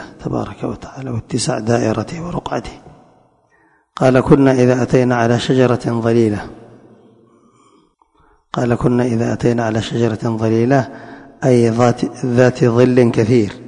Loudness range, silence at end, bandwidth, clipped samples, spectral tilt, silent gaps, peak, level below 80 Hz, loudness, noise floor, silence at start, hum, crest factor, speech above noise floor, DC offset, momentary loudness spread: 7 LU; 0 s; 10.5 kHz; under 0.1%; -7 dB/octave; none; 0 dBFS; -42 dBFS; -15 LUFS; -56 dBFS; 0 s; none; 16 dB; 41 dB; under 0.1%; 14 LU